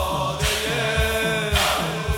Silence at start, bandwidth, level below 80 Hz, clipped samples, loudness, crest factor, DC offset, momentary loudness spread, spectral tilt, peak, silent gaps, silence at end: 0 s; 18 kHz; -32 dBFS; under 0.1%; -21 LUFS; 16 dB; under 0.1%; 3 LU; -3.5 dB/octave; -6 dBFS; none; 0 s